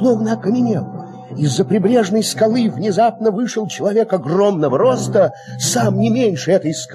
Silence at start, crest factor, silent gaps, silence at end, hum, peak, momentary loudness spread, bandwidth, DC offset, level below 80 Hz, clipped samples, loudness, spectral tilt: 0 s; 12 dB; none; 0 s; none; -2 dBFS; 6 LU; 13.5 kHz; under 0.1%; -62 dBFS; under 0.1%; -16 LUFS; -5.5 dB/octave